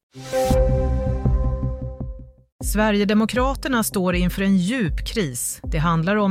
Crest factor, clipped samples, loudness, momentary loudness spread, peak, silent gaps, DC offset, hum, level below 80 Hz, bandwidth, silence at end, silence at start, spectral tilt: 14 dB; under 0.1%; -21 LUFS; 8 LU; -6 dBFS; 2.52-2.59 s; under 0.1%; none; -28 dBFS; 16 kHz; 0 s; 0.15 s; -5.5 dB/octave